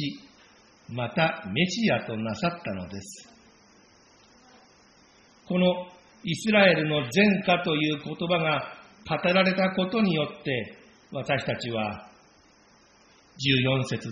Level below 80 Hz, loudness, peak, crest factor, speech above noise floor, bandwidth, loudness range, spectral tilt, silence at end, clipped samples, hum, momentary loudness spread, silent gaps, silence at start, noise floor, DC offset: -62 dBFS; -25 LUFS; -6 dBFS; 22 dB; 33 dB; 7.4 kHz; 9 LU; -4 dB/octave; 0 s; under 0.1%; none; 17 LU; none; 0 s; -58 dBFS; under 0.1%